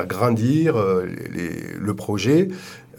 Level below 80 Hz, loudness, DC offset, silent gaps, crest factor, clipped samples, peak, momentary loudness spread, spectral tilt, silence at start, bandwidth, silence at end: -56 dBFS; -21 LUFS; under 0.1%; none; 16 dB; under 0.1%; -4 dBFS; 11 LU; -7 dB/octave; 0 s; 19 kHz; 0.2 s